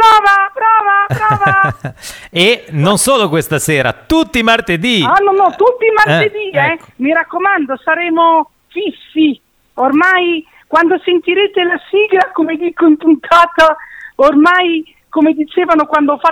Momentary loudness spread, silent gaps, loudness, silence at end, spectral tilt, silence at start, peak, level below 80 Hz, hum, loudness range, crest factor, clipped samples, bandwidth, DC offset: 9 LU; none; -11 LUFS; 0 s; -4.5 dB/octave; 0 s; 0 dBFS; -44 dBFS; none; 2 LU; 12 dB; under 0.1%; 18 kHz; under 0.1%